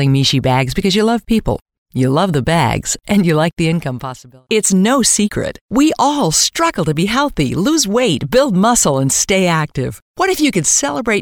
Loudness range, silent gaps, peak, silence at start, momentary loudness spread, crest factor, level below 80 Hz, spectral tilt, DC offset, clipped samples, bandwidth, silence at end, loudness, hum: 2 LU; 1.62-1.66 s, 1.78-1.86 s, 5.61-5.69 s, 10.02-10.14 s; -2 dBFS; 0 s; 7 LU; 12 dB; -36 dBFS; -4 dB/octave; under 0.1%; under 0.1%; 19.5 kHz; 0 s; -14 LUFS; none